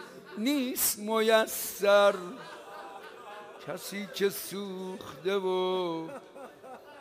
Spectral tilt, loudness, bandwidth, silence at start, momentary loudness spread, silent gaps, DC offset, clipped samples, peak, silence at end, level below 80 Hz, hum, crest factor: -3 dB/octave; -29 LUFS; 16 kHz; 0 s; 21 LU; none; under 0.1%; under 0.1%; -10 dBFS; 0 s; -74 dBFS; none; 20 dB